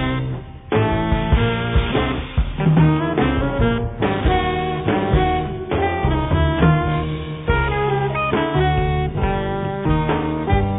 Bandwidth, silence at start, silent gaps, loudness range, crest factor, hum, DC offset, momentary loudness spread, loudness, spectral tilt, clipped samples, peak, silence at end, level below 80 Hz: 4 kHz; 0 s; none; 1 LU; 16 dB; none; under 0.1%; 7 LU; -19 LUFS; -6 dB/octave; under 0.1%; -2 dBFS; 0 s; -26 dBFS